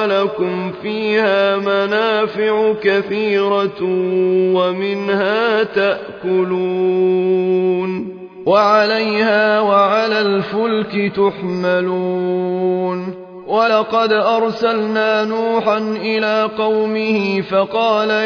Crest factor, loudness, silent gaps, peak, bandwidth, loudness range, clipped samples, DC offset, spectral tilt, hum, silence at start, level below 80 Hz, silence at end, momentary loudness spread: 14 dB; -16 LUFS; none; -2 dBFS; 5.4 kHz; 2 LU; under 0.1%; under 0.1%; -6.5 dB/octave; none; 0 s; -62 dBFS; 0 s; 6 LU